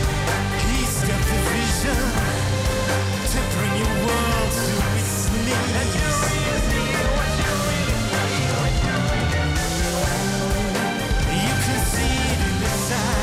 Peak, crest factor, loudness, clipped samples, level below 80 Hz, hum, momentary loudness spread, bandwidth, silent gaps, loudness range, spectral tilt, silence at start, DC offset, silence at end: -10 dBFS; 10 dB; -21 LUFS; under 0.1%; -28 dBFS; none; 2 LU; 16 kHz; none; 1 LU; -4 dB/octave; 0 s; under 0.1%; 0 s